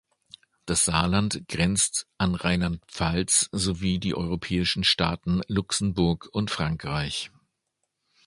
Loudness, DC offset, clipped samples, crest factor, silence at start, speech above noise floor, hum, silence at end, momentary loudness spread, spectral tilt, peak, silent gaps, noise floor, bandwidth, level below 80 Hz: -25 LUFS; under 0.1%; under 0.1%; 20 dB; 0.65 s; 54 dB; none; 1 s; 7 LU; -3.5 dB/octave; -6 dBFS; none; -79 dBFS; 11.5 kHz; -42 dBFS